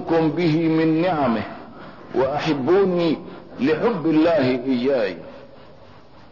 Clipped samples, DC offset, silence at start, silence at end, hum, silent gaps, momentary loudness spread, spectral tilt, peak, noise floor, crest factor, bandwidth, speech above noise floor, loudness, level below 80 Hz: under 0.1%; 0.4%; 0 s; 0.85 s; none; none; 18 LU; -8 dB/octave; -8 dBFS; -46 dBFS; 12 dB; 6 kHz; 27 dB; -20 LUFS; -56 dBFS